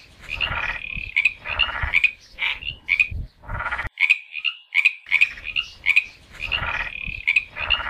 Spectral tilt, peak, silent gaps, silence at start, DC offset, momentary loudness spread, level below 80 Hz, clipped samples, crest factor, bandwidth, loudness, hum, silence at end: -2.5 dB/octave; -4 dBFS; none; 0 s; under 0.1%; 10 LU; -40 dBFS; under 0.1%; 20 dB; 14 kHz; -21 LUFS; none; 0 s